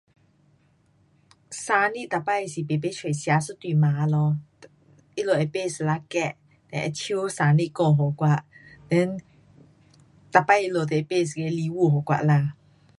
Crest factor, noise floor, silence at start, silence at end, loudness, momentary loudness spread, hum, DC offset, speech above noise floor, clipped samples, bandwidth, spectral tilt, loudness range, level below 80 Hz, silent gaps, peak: 24 dB; -62 dBFS; 1.5 s; 0.45 s; -24 LUFS; 9 LU; none; under 0.1%; 39 dB; under 0.1%; 11.5 kHz; -6.5 dB/octave; 3 LU; -66 dBFS; none; -2 dBFS